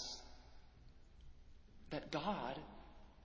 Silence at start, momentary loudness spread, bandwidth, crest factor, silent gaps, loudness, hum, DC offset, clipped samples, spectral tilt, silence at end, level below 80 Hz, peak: 0 s; 24 LU; 8 kHz; 22 dB; none; -46 LUFS; none; under 0.1%; under 0.1%; -4.5 dB/octave; 0 s; -62 dBFS; -26 dBFS